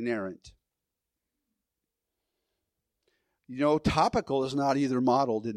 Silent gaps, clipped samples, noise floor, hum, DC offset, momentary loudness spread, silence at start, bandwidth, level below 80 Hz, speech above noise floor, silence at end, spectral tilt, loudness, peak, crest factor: none; under 0.1%; -87 dBFS; none; under 0.1%; 9 LU; 0 s; 12 kHz; -54 dBFS; 60 dB; 0 s; -6 dB/octave; -27 LUFS; -10 dBFS; 20 dB